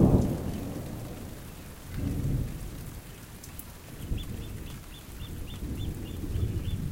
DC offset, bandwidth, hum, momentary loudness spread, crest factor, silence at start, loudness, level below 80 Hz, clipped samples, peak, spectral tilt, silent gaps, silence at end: under 0.1%; 17 kHz; none; 13 LU; 22 dB; 0 s; -35 LUFS; -38 dBFS; under 0.1%; -10 dBFS; -7 dB/octave; none; 0 s